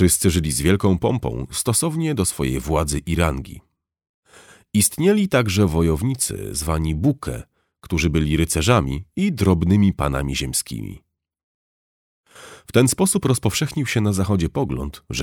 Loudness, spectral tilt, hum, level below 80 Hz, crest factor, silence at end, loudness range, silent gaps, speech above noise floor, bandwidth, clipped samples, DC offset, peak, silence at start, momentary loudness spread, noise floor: -20 LUFS; -5 dB/octave; none; -34 dBFS; 18 dB; 0 s; 3 LU; 4.09-4.23 s, 11.43-12.24 s; 30 dB; 19 kHz; under 0.1%; under 0.1%; -2 dBFS; 0 s; 9 LU; -49 dBFS